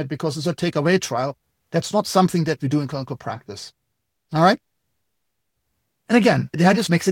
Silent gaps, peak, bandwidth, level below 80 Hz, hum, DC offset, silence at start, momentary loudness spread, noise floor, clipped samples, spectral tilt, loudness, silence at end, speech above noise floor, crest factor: none; -2 dBFS; 17 kHz; -60 dBFS; none; under 0.1%; 0 s; 14 LU; -77 dBFS; under 0.1%; -5.5 dB/octave; -20 LUFS; 0 s; 58 dB; 20 dB